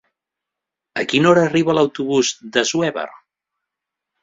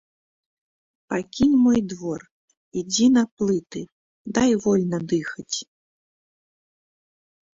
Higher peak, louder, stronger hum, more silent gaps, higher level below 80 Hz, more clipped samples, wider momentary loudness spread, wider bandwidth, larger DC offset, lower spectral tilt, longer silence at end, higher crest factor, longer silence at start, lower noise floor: first, 0 dBFS vs -6 dBFS; first, -17 LUFS vs -22 LUFS; neither; second, none vs 2.31-2.48 s, 2.57-2.71 s, 3.32-3.37 s, 3.92-4.25 s; about the same, -60 dBFS vs -56 dBFS; neither; about the same, 14 LU vs 16 LU; about the same, 7.8 kHz vs 7.8 kHz; neither; about the same, -4.5 dB/octave vs -5 dB/octave; second, 1.05 s vs 1.9 s; about the same, 20 dB vs 18 dB; second, 0.95 s vs 1.1 s; second, -84 dBFS vs under -90 dBFS